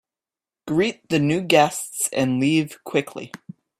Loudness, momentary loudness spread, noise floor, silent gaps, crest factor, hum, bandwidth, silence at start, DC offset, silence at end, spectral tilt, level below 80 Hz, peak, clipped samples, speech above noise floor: -21 LUFS; 19 LU; under -90 dBFS; none; 20 dB; none; 15.5 kHz; 0.65 s; under 0.1%; 0.45 s; -4.5 dB/octave; -62 dBFS; -2 dBFS; under 0.1%; over 69 dB